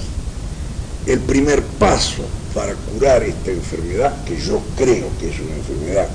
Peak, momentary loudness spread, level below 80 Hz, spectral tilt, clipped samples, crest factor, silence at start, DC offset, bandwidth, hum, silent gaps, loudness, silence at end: -2 dBFS; 13 LU; -26 dBFS; -5 dB/octave; under 0.1%; 16 dB; 0 s; under 0.1%; 10.5 kHz; none; none; -19 LUFS; 0 s